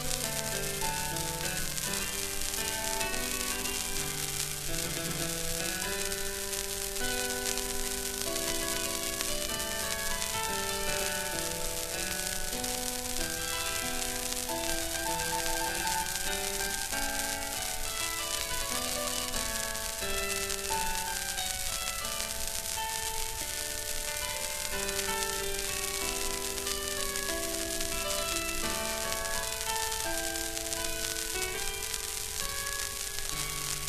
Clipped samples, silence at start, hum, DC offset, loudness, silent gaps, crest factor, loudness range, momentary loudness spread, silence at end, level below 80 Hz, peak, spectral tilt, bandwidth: under 0.1%; 0 s; none; 0.3%; -31 LUFS; none; 26 dB; 1 LU; 2 LU; 0 s; -44 dBFS; -8 dBFS; -1 dB/octave; 14 kHz